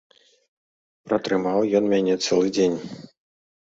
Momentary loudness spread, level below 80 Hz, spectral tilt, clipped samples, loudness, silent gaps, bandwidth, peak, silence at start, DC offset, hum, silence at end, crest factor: 11 LU; -64 dBFS; -5 dB/octave; under 0.1%; -22 LUFS; none; 8 kHz; -6 dBFS; 1.05 s; under 0.1%; none; 0.65 s; 18 dB